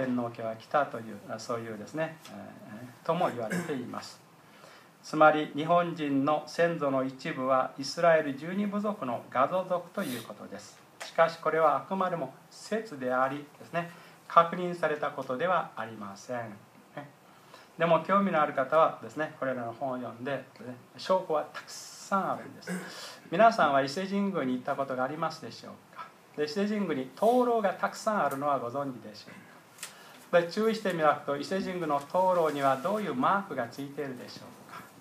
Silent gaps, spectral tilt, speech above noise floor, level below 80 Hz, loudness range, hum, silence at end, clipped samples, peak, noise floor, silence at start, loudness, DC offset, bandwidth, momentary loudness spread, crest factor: none; -5.5 dB/octave; 25 dB; -82 dBFS; 6 LU; none; 0.1 s; under 0.1%; -6 dBFS; -54 dBFS; 0 s; -30 LUFS; under 0.1%; 15.5 kHz; 20 LU; 24 dB